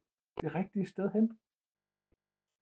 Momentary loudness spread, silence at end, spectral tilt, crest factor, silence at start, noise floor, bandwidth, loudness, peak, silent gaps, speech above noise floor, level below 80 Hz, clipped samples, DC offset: 9 LU; 1.25 s; -9.5 dB/octave; 18 dB; 0.35 s; -81 dBFS; 7.6 kHz; -35 LUFS; -18 dBFS; none; 48 dB; -72 dBFS; under 0.1%; under 0.1%